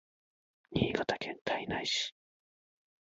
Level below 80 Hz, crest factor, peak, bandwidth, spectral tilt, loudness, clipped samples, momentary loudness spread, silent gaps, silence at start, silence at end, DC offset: -60 dBFS; 24 dB; -14 dBFS; 7.6 kHz; -3 dB/octave; -34 LUFS; under 0.1%; 6 LU; 1.41-1.45 s; 0.7 s; 0.95 s; under 0.1%